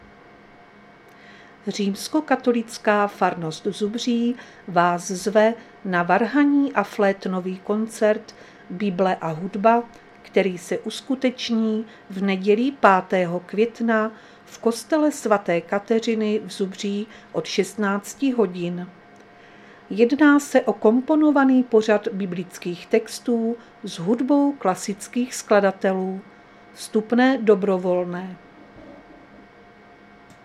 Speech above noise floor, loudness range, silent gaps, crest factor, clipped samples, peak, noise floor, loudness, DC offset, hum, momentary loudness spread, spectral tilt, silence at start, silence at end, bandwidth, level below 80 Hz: 27 dB; 5 LU; none; 22 dB; under 0.1%; 0 dBFS; -48 dBFS; -22 LUFS; under 0.1%; none; 11 LU; -5.5 dB/octave; 1.3 s; 1.45 s; 14.5 kHz; -66 dBFS